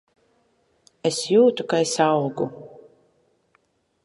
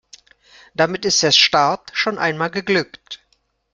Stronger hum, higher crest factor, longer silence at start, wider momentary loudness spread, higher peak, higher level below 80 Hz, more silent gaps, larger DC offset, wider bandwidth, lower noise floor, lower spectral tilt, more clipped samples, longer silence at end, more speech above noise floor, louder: neither; about the same, 20 dB vs 18 dB; first, 1.05 s vs 0.8 s; second, 12 LU vs 21 LU; about the same, -4 dBFS vs -2 dBFS; second, -72 dBFS vs -60 dBFS; neither; neither; about the same, 11.5 kHz vs 11.5 kHz; about the same, -66 dBFS vs -65 dBFS; first, -4.5 dB/octave vs -2.5 dB/octave; neither; first, 1.4 s vs 0.6 s; about the same, 46 dB vs 47 dB; second, -21 LUFS vs -16 LUFS